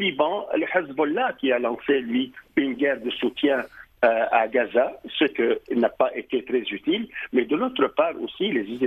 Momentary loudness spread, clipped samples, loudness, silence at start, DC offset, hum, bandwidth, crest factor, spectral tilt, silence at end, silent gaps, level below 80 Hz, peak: 5 LU; under 0.1%; -24 LUFS; 0 s; under 0.1%; none; 13 kHz; 16 dB; -7 dB/octave; 0 s; none; -62 dBFS; -6 dBFS